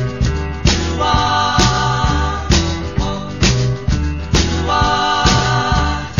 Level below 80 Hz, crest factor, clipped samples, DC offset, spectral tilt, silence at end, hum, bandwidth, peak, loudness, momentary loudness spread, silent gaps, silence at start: -22 dBFS; 16 dB; under 0.1%; 1%; -4.5 dB/octave; 0 s; none; 7.4 kHz; 0 dBFS; -16 LUFS; 6 LU; none; 0 s